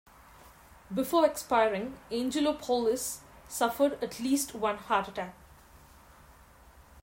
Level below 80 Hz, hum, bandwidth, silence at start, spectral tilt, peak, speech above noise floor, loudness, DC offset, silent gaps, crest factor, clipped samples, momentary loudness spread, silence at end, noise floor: -60 dBFS; none; 16.5 kHz; 0.45 s; -3.5 dB/octave; -12 dBFS; 27 dB; -30 LUFS; under 0.1%; none; 20 dB; under 0.1%; 11 LU; 0.05 s; -56 dBFS